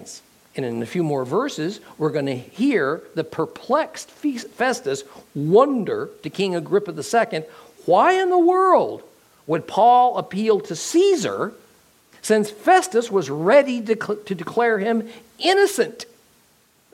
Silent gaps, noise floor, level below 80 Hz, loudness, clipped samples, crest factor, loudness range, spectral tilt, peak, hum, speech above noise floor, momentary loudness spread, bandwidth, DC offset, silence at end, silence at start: none; -59 dBFS; -70 dBFS; -20 LUFS; under 0.1%; 18 dB; 6 LU; -5 dB/octave; -2 dBFS; none; 39 dB; 14 LU; 16 kHz; under 0.1%; 0.9 s; 0 s